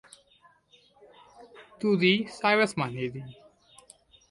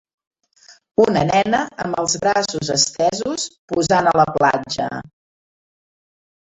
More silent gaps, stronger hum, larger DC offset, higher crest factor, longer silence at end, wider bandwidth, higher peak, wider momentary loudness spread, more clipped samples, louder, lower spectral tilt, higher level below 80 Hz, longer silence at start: second, none vs 0.91-0.95 s, 3.58-3.68 s; neither; neither; about the same, 20 dB vs 18 dB; second, 1 s vs 1.4 s; first, 11.5 kHz vs 8.4 kHz; second, -10 dBFS vs -2 dBFS; first, 15 LU vs 9 LU; neither; second, -26 LUFS vs -18 LUFS; first, -5.5 dB/octave vs -3.5 dB/octave; second, -68 dBFS vs -52 dBFS; first, 1.4 s vs 0.7 s